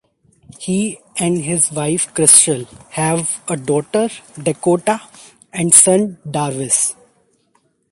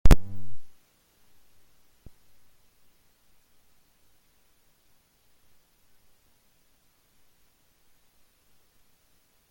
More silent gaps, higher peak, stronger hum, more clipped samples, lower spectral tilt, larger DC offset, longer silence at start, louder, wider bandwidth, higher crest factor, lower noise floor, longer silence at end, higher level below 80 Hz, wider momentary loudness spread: neither; first, 0 dBFS vs -4 dBFS; neither; first, 0.1% vs under 0.1%; second, -3.5 dB/octave vs -6 dB/octave; neither; first, 0.6 s vs 0.05 s; first, -14 LUFS vs -28 LUFS; about the same, 16 kHz vs 16 kHz; second, 18 dB vs 24 dB; second, -61 dBFS vs -65 dBFS; second, 1 s vs 8.8 s; second, -58 dBFS vs -34 dBFS; second, 15 LU vs 34 LU